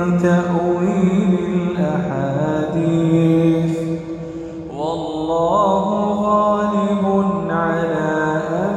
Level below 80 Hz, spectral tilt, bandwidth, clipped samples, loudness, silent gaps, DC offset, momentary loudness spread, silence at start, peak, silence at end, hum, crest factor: -48 dBFS; -8 dB/octave; 9 kHz; under 0.1%; -18 LUFS; none; under 0.1%; 8 LU; 0 s; -4 dBFS; 0 s; none; 14 dB